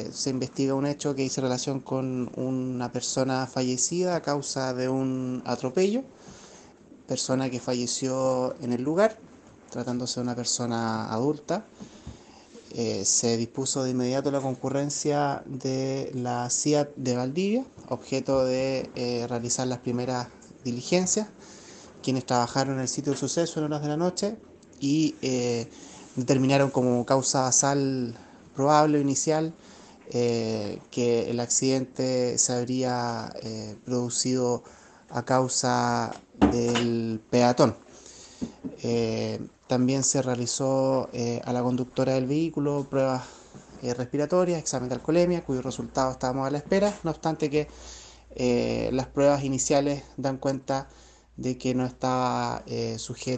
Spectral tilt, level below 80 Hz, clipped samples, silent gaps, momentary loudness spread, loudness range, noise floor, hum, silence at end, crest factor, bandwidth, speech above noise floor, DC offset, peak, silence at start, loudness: -4.5 dB/octave; -56 dBFS; under 0.1%; none; 11 LU; 4 LU; -51 dBFS; none; 0 s; 22 dB; 9 kHz; 25 dB; under 0.1%; -6 dBFS; 0 s; -27 LUFS